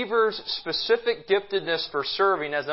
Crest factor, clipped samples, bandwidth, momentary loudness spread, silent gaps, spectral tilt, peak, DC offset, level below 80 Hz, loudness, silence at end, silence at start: 16 dB; under 0.1%; 5.8 kHz; 4 LU; none; -7 dB/octave; -10 dBFS; under 0.1%; -64 dBFS; -25 LUFS; 0 s; 0 s